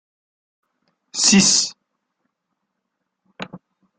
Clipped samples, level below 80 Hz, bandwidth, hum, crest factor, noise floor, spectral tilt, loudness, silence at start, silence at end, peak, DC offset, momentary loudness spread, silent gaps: under 0.1%; -62 dBFS; 10.5 kHz; none; 22 dB; -78 dBFS; -2 dB/octave; -15 LUFS; 1.15 s; 0.4 s; -2 dBFS; under 0.1%; 24 LU; none